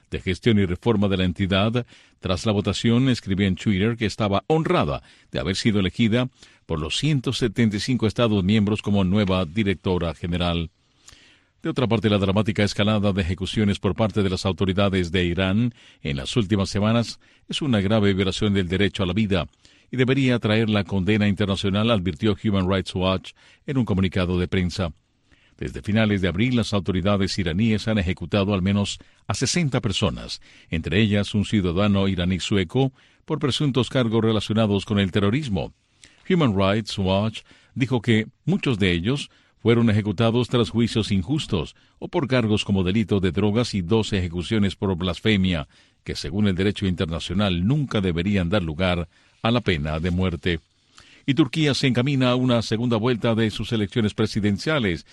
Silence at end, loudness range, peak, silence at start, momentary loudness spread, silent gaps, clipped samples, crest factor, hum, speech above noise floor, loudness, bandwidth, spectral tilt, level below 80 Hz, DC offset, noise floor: 0.1 s; 2 LU; -6 dBFS; 0.1 s; 8 LU; none; under 0.1%; 16 dB; none; 38 dB; -22 LUFS; 11.5 kHz; -6 dB/octave; -44 dBFS; under 0.1%; -59 dBFS